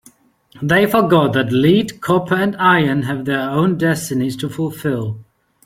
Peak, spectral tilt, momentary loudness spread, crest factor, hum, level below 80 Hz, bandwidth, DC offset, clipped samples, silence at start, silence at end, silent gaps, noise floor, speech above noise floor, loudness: 0 dBFS; -6 dB/octave; 9 LU; 16 dB; none; -52 dBFS; 16.5 kHz; under 0.1%; under 0.1%; 0.55 s; 0.45 s; none; -50 dBFS; 35 dB; -16 LUFS